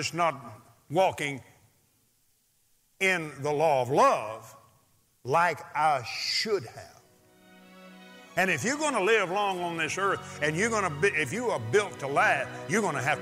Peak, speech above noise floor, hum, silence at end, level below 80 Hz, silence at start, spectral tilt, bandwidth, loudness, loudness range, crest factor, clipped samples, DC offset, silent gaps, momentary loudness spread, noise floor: -10 dBFS; 41 dB; none; 0 s; -72 dBFS; 0 s; -3.5 dB/octave; 16 kHz; -27 LUFS; 4 LU; 18 dB; under 0.1%; under 0.1%; none; 9 LU; -69 dBFS